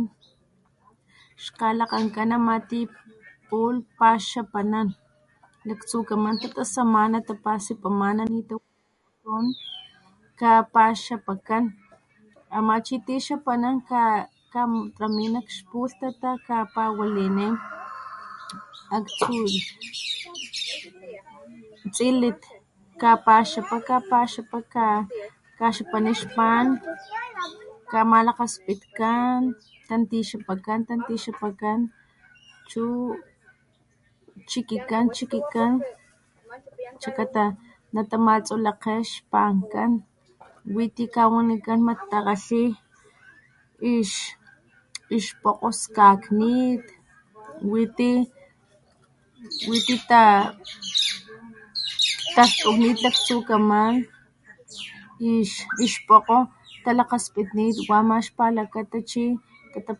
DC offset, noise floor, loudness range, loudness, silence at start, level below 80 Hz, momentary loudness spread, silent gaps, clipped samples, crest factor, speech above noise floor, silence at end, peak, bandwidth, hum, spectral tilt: under 0.1%; -69 dBFS; 8 LU; -23 LUFS; 0 s; -66 dBFS; 16 LU; none; under 0.1%; 22 dB; 46 dB; 0.05 s; -2 dBFS; 11.5 kHz; none; -4 dB/octave